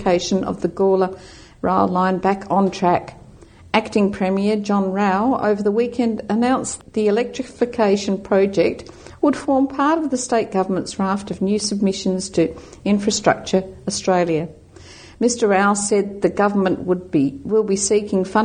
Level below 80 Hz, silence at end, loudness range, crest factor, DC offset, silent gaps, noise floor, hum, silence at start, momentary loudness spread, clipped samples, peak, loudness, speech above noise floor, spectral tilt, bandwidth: -50 dBFS; 0 s; 1 LU; 18 dB; under 0.1%; none; -44 dBFS; none; 0 s; 5 LU; under 0.1%; 0 dBFS; -19 LUFS; 25 dB; -5 dB/octave; 9.8 kHz